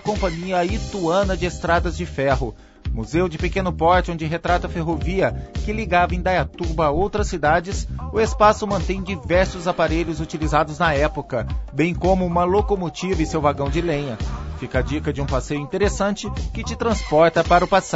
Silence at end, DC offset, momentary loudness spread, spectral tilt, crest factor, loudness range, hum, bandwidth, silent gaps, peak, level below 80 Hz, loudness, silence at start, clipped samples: 0 s; under 0.1%; 10 LU; -6 dB/octave; 18 dB; 3 LU; none; 8 kHz; none; -2 dBFS; -30 dBFS; -21 LUFS; 0 s; under 0.1%